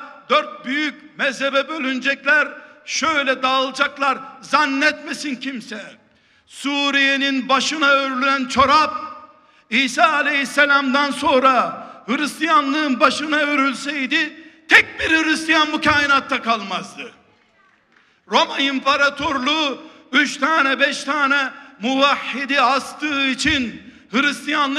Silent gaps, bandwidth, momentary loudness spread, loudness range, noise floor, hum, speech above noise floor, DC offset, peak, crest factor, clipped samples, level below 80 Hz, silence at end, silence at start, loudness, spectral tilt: none; 14 kHz; 11 LU; 4 LU; -57 dBFS; none; 39 dB; under 0.1%; 0 dBFS; 20 dB; under 0.1%; -54 dBFS; 0 s; 0 s; -18 LUFS; -2.5 dB/octave